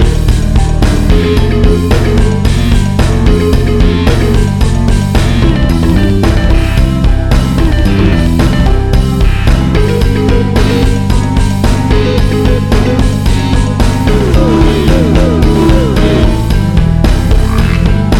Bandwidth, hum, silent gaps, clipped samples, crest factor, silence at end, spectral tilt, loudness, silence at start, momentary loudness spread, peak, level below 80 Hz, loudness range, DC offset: 15 kHz; none; none; 2%; 8 dB; 0 s; -7 dB/octave; -10 LUFS; 0 s; 2 LU; 0 dBFS; -10 dBFS; 1 LU; under 0.1%